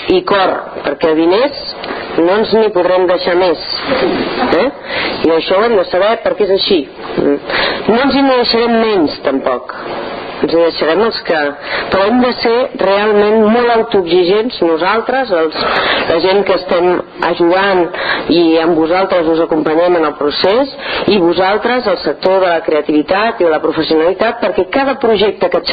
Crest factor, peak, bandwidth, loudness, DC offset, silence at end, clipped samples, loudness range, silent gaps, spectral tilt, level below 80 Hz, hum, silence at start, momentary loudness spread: 12 dB; 0 dBFS; 5 kHz; -12 LUFS; under 0.1%; 0 s; under 0.1%; 2 LU; none; -8 dB/octave; -44 dBFS; none; 0 s; 6 LU